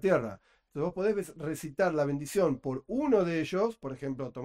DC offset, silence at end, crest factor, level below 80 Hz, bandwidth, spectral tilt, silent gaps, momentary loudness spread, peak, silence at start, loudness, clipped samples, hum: under 0.1%; 0 s; 16 dB; -60 dBFS; 16 kHz; -6.5 dB/octave; none; 10 LU; -14 dBFS; 0.05 s; -31 LUFS; under 0.1%; none